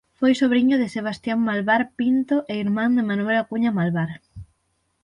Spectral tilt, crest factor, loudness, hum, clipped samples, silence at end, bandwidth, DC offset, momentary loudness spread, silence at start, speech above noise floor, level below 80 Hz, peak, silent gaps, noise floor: -7 dB/octave; 14 dB; -21 LUFS; none; under 0.1%; 0.6 s; 10.5 kHz; under 0.1%; 8 LU; 0.2 s; 50 dB; -58 dBFS; -8 dBFS; none; -70 dBFS